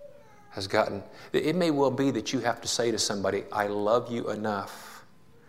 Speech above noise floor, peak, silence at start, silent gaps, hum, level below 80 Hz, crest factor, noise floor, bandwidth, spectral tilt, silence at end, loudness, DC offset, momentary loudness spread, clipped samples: 28 dB; -8 dBFS; 0 s; none; none; -64 dBFS; 20 dB; -56 dBFS; 16 kHz; -4 dB/octave; 0.45 s; -28 LUFS; 0.2%; 13 LU; under 0.1%